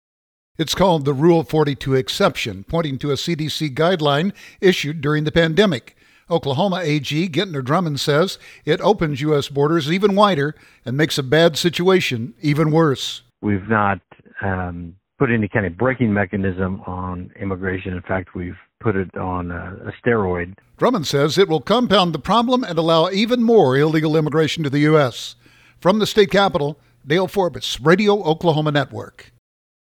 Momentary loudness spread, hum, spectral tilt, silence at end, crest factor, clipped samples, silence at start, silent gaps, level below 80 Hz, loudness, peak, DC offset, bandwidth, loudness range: 12 LU; none; -6 dB/octave; 0.65 s; 18 dB; under 0.1%; 0.6 s; none; -48 dBFS; -18 LUFS; 0 dBFS; under 0.1%; 18.5 kHz; 6 LU